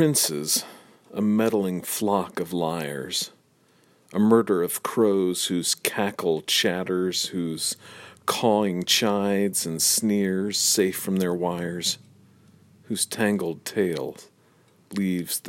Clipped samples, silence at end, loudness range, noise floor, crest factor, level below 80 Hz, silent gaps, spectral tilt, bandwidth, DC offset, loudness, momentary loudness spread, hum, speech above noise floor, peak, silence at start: under 0.1%; 0 s; 5 LU; -61 dBFS; 24 dB; -68 dBFS; none; -3.5 dB/octave; 16.5 kHz; under 0.1%; -24 LUFS; 9 LU; none; 37 dB; -2 dBFS; 0 s